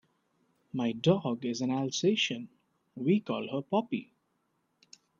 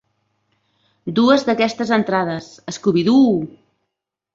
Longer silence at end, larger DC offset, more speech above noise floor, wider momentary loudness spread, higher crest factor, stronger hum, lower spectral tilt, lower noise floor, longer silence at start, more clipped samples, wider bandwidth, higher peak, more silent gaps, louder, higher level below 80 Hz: first, 1.15 s vs 0.85 s; neither; second, 46 dB vs 63 dB; second, 10 LU vs 16 LU; about the same, 20 dB vs 16 dB; neither; about the same, -5 dB/octave vs -6 dB/octave; about the same, -77 dBFS vs -80 dBFS; second, 0.75 s vs 1.05 s; neither; about the same, 7.6 kHz vs 7.6 kHz; second, -12 dBFS vs -2 dBFS; neither; second, -31 LUFS vs -17 LUFS; second, -76 dBFS vs -60 dBFS